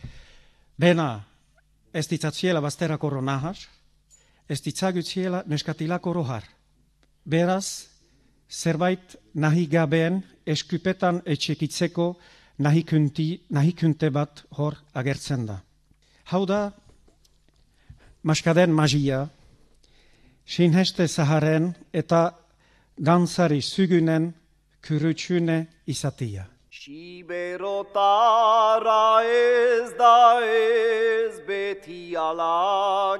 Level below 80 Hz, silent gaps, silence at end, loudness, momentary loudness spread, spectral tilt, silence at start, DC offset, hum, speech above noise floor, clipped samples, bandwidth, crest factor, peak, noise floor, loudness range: -58 dBFS; none; 0 s; -23 LUFS; 14 LU; -6 dB/octave; 0.05 s; under 0.1%; none; 40 dB; under 0.1%; 13 kHz; 18 dB; -4 dBFS; -62 dBFS; 9 LU